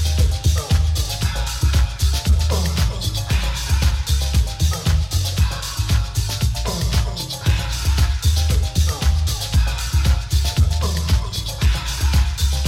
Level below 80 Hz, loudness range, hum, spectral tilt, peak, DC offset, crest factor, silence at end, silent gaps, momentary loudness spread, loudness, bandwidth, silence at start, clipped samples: -20 dBFS; 1 LU; none; -4 dB/octave; -4 dBFS; under 0.1%; 14 dB; 0 s; none; 3 LU; -20 LUFS; 16.5 kHz; 0 s; under 0.1%